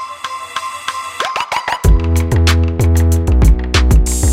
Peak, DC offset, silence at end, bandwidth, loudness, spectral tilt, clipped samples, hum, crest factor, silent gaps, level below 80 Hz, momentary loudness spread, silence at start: 0 dBFS; under 0.1%; 0 s; 16 kHz; -14 LUFS; -5 dB/octave; under 0.1%; none; 12 dB; none; -14 dBFS; 10 LU; 0 s